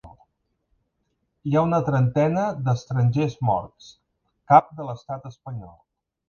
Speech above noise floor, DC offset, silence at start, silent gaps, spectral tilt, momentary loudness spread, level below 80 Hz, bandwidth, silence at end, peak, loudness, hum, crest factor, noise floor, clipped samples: 52 dB; under 0.1%; 0.05 s; none; -8.5 dB/octave; 19 LU; -54 dBFS; 7 kHz; 0.6 s; 0 dBFS; -22 LUFS; none; 24 dB; -74 dBFS; under 0.1%